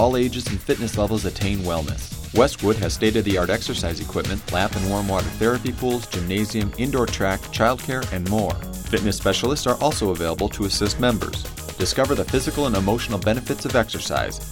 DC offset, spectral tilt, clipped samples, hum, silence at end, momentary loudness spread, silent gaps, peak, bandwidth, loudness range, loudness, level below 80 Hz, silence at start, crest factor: under 0.1%; -5 dB/octave; under 0.1%; none; 0 s; 6 LU; none; -2 dBFS; 19 kHz; 1 LU; -22 LUFS; -34 dBFS; 0 s; 18 dB